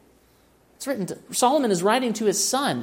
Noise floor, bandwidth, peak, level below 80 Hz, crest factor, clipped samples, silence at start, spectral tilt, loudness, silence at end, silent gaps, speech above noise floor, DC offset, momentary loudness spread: -58 dBFS; 16.5 kHz; -6 dBFS; -66 dBFS; 18 dB; under 0.1%; 0.8 s; -3 dB/octave; -22 LUFS; 0 s; none; 36 dB; under 0.1%; 10 LU